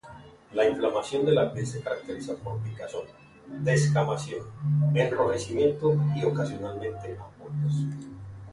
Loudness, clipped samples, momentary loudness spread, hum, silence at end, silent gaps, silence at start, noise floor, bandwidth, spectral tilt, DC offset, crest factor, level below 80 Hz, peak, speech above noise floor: -27 LUFS; under 0.1%; 15 LU; none; 0 s; none; 0.05 s; -48 dBFS; 11.5 kHz; -6.5 dB/octave; under 0.1%; 16 dB; -58 dBFS; -10 dBFS; 21 dB